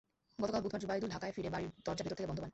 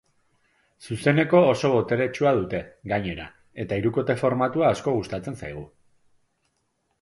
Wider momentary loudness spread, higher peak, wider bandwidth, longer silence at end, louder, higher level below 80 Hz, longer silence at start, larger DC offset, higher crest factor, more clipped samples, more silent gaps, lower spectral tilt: second, 4 LU vs 17 LU; second, -24 dBFS vs -4 dBFS; second, 8.2 kHz vs 11.5 kHz; second, 0.05 s vs 1.35 s; second, -40 LUFS vs -23 LUFS; second, -62 dBFS vs -54 dBFS; second, 0.4 s vs 0.8 s; neither; about the same, 18 dB vs 20 dB; neither; neither; about the same, -6 dB/octave vs -7 dB/octave